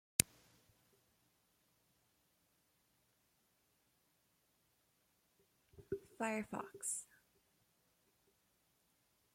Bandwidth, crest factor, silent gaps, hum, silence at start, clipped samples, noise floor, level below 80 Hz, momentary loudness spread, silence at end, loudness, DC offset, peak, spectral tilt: 16.5 kHz; 44 dB; none; none; 0.2 s; under 0.1%; -79 dBFS; -72 dBFS; 13 LU; 2.3 s; -42 LUFS; under 0.1%; -6 dBFS; -2 dB/octave